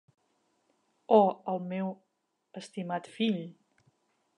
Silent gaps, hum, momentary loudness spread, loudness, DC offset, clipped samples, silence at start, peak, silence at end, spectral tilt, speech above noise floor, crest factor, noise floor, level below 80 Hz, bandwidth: none; none; 23 LU; -30 LUFS; under 0.1%; under 0.1%; 1.1 s; -8 dBFS; 0.85 s; -7 dB/octave; 45 dB; 24 dB; -74 dBFS; -88 dBFS; 10.5 kHz